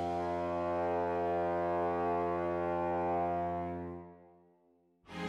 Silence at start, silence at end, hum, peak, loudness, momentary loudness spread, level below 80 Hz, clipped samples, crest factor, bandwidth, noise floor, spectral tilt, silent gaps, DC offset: 0 s; 0 s; none; -24 dBFS; -34 LUFS; 10 LU; -62 dBFS; under 0.1%; 12 dB; 9 kHz; -70 dBFS; -8 dB/octave; none; under 0.1%